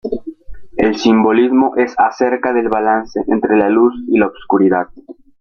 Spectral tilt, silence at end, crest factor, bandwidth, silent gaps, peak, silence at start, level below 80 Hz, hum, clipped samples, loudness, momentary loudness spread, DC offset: -6.5 dB/octave; 0.3 s; 14 dB; 6.8 kHz; none; 0 dBFS; 0.05 s; -46 dBFS; none; under 0.1%; -14 LUFS; 9 LU; under 0.1%